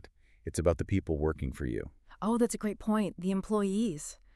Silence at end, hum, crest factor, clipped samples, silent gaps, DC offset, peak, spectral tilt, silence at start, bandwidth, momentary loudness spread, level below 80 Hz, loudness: 0.2 s; none; 18 dB; under 0.1%; none; under 0.1%; -14 dBFS; -6.5 dB/octave; 0.45 s; 13 kHz; 9 LU; -46 dBFS; -32 LUFS